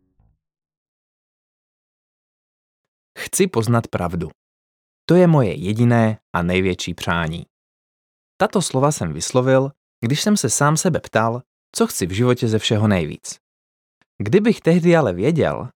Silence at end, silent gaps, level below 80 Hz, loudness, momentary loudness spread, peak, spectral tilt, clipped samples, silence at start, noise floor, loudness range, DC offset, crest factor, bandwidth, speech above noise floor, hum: 0.1 s; 4.35-5.08 s, 6.22-6.34 s, 7.50-8.39 s, 9.77-10.02 s, 11.46-11.73 s, 13.40-14.19 s; -50 dBFS; -19 LUFS; 13 LU; -2 dBFS; -5.5 dB/octave; under 0.1%; 3.15 s; -62 dBFS; 6 LU; under 0.1%; 18 dB; 18.5 kHz; 44 dB; none